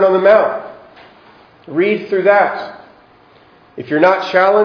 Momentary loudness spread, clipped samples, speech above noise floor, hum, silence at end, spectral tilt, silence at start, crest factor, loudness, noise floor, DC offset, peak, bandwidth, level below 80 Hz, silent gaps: 18 LU; under 0.1%; 34 dB; none; 0 s; -7 dB/octave; 0 s; 14 dB; -13 LUFS; -47 dBFS; under 0.1%; 0 dBFS; 5.4 kHz; -62 dBFS; none